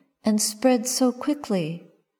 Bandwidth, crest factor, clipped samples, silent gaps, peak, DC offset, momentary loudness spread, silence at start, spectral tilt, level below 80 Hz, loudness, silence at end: over 20 kHz; 18 dB; under 0.1%; none; -6 dBFS; under 0.1%; 9 LU; 0.25 s; -4 dB/octave; -70 dBFS; -23 LUFS; 0.4 s